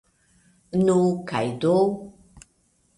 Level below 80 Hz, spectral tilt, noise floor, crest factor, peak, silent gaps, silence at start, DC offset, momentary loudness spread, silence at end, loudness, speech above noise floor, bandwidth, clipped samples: -58 dBFS; -7 dB/octave; -65 dBFS; 16 dB; -10 dBFS; none; 0.75 s; under 0.1%; 8 LU; 0.9 s; -22 LUFS; 44 dB; 11.5 kHz; under 0.1%